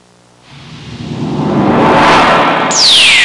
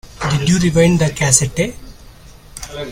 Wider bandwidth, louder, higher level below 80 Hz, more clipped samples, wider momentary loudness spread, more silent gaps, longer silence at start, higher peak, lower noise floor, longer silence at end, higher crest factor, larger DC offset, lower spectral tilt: second, 11.5 kHz vs 17 kHz; first, -7 LUFS vs -14 LUFS; about the same, -40 dBFS vs -36 dBFS; neither; first, 19 LU vs 16 LU; neither; first, 0.5 s vs 0.2 s; about the same, 0 dBFS vs 0 dBFS; about the same, -43 dBFS vs -40 dBFS; about the same, 0 s vs 0 s; second, 10 dB vs 16 dB; neither; second, -3 dB/octave vs -4.5 dB/octave